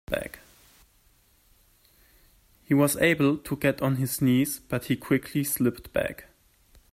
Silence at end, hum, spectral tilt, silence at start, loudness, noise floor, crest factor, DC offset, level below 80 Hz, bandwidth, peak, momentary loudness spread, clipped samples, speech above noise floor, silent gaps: 0.7 s; none; -5.5 dB/octave; 0.1 s; -26 LUFS; -62 dBFS; 20 dB; under 0.1%; -54 dBFS; 16 kHz; -8 dBFS; 11 LU; under 0.1%; 37 dB; none